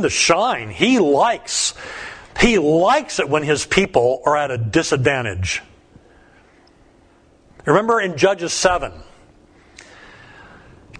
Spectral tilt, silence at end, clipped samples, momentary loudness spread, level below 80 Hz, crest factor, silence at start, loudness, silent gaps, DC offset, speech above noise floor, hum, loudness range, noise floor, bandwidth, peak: -4 dB/octave; 0 s; under 0.1%; 9 LU; -42 dBFS; 20 dB; 0 s; -17 LUFS; none; under 0.1%; 35 dB; none; 6 LU; -52 dBFS; 10.5 kHz; 0 dBFS